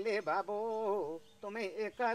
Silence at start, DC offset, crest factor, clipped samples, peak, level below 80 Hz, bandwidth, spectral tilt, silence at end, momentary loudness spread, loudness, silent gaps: 0 s; under 0.1%; 14 dB; under 0.1%; -22 dBFS; -82 dBFS; 13.5 kHz; -5 dB/octave; 0 s; 9 LU; -38 LUFS; none